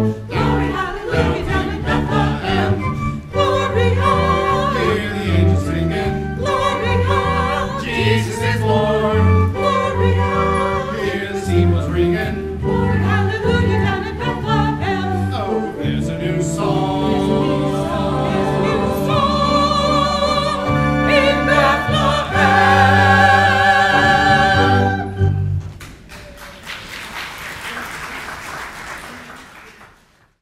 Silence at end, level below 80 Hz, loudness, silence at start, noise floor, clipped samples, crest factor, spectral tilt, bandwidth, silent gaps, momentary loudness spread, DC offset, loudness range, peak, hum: 0.55 s; -32 dBFS; -16 LUFS; 0 s; -53 dBFS; under 0.1%; 16 dB; -6 dB/octave; 14.5 kHz; none; 15 LU; under 0.1%; 9 LU; 0 dBFS; none